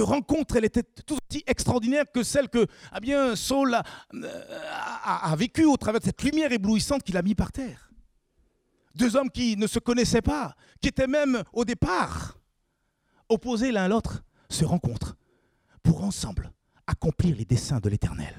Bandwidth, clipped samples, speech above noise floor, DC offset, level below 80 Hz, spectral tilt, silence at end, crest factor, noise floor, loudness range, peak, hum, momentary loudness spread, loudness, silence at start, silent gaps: 16 kHz; under 0.1%; 49 dB; under 0.1%; -44 dBFS; -5.5 dB/octave; 0 s; 20 dB; -74 dBFS; 3 LU; -6 dBFS; none; 13 LU; -26 LUFS; 0 s; none